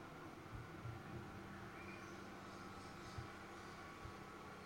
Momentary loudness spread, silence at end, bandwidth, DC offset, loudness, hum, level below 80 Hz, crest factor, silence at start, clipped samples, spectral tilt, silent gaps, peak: 2 LU; 0 s; 16.5 kHz; under 0.1%; -54 LUFS; none; -68 dBFS; 16 dB; 0 s; under 0.1%; -5.5 dB/octave; none; -38 dBFS